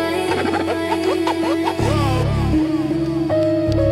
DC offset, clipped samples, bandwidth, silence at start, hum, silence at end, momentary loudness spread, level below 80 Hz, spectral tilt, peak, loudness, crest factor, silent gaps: under 0.1%; under 0.1%; 14 kHz; 0 s; none; 0 s; 2 LU; -32 dBFS; -6.5 dB/octave; -6 dBFS; -19 LUFS; 12 dB; none